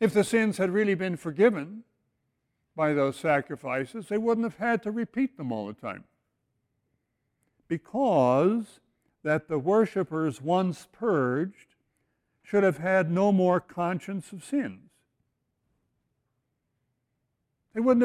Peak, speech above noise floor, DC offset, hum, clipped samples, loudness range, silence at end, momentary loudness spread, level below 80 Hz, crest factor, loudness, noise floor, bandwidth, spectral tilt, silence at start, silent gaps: -8 dBFS; 53 dB; under 0.1%; none; under 0.1%; 9 LU; 0 s; 13 LU; -70 dBFS; 20 dB; -27 LUFS; -79 dBFS; 16 kHz; -7 dB/octave; 0 s; none